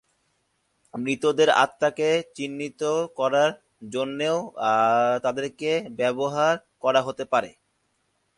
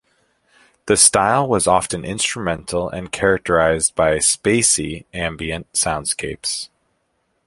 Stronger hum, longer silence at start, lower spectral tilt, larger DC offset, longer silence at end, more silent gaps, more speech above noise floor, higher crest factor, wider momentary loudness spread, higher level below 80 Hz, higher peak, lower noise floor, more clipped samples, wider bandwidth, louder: neither; about the same, 0.95 s vs 0.85 s; first, -4 dB/octave vs -2.5 dB/octave; neither; about the same, 0.9 s vs 0.8 s; neither; about the same, 48 dB vs 50 dB; about the same, 20 dB vs 20 dB; about the same, 11 LU vs 13 LU; second, -70 dBFS vs -42 dBFS; second, -4 dBFS vs 0 dBFS; first, -72 dBFS vs -68 dBFS; neither; second, 11.5 kHz vs 16 kHz; second, -24 LUFS vs -17 LUFS